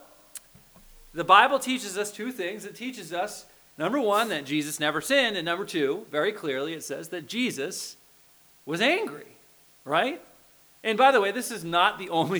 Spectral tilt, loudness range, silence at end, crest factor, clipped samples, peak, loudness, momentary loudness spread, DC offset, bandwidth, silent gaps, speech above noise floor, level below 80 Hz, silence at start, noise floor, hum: -3 dB/octave; 5 LU; 0 s; 24 dB; under 0.1%; -4 dBFS; -26 LUFS; 18 LU; under 0.1%; over 20 kHz; none; 32 dB; -66 dBFS; 0.35 s; -58 dBFS; none